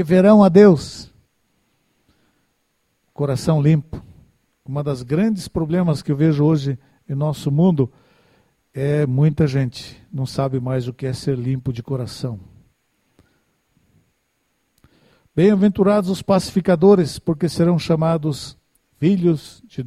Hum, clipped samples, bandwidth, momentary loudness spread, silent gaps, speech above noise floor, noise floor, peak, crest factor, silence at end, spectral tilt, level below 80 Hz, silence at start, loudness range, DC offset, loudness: none; under 0.1%; 13.5 kHz; 16 LU; none; 51 dB; -68 dBFS; 0 dBFS; 18 dB; 0 s; -8 dB/octave; -48 dBFS; 0 s; 9 LU; under 0.1%; -18 LUFS